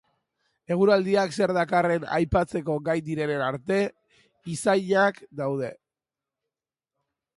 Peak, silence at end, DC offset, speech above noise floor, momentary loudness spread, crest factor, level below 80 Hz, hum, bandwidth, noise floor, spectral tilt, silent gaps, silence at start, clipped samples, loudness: -8 dBFS; 1.6 s; under 0.1%; 65 dB; 10 LU; 18 dB; -50 dBFS; none; 11.5 kHz; -90 dBFS; -6 dB/octave; none; 0.7 s; under 0.1%; -25 LUFS